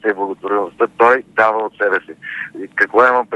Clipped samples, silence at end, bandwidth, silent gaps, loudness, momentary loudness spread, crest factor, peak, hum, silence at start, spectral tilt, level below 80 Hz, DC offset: under 0.1%; 0 s; 9.4 kHz; none; -15 LUFS; 14 LU; 16 dB; 0 dBFS; none; 0.05 s; -5.5 dB/octave; -62 dBFS; under 0.1%